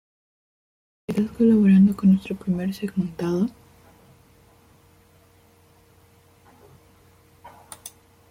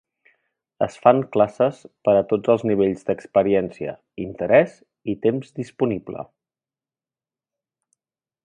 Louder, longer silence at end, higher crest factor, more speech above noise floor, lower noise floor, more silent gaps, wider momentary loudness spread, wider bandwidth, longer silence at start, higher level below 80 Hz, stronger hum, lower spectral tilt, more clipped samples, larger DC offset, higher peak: about the same, -21 LUFS vs -21 LUFS; second, 0.4 s vs 2.2 s; second, 16 dB vs 22 dB; second, 36 dB vs over 70 dB; second, -56 dBFS vs under -90 dBFS; neither; first, 25 LU vs 16 LU; first, 16 kHz vs 9.8 kHz; first, 1.1 s vs 0.8 s; about the same, -58 dBFS vs -58 dBFS; neither; about the same, -8.5 dB/octave vs -8 dB/octave; neither; neither; second, -8 dBFS vs 0 dBFS